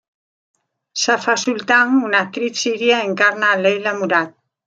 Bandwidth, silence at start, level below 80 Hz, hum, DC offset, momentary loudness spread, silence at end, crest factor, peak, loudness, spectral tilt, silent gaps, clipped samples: 9.2 kHz; 0.95 s; -72 dBFS; none; under 0.1%; 7 LU; 0.35 s; 18 dB; -2 dBFS; -16 LUFS; -2.5 dB/octave; none; under 0.1%